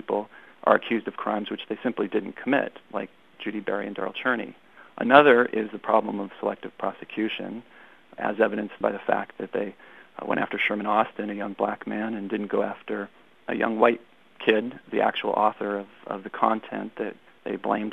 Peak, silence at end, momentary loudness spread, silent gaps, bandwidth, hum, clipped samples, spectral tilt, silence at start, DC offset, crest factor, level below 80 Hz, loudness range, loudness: 0 dBFS; 0 s; 13 LU; none; 10 kHz; none; under 0.1%; -7 dB/octave; 0.1 s; 0.1%; 26 dB; -76 dBFS; 6 LU; -26 LUFS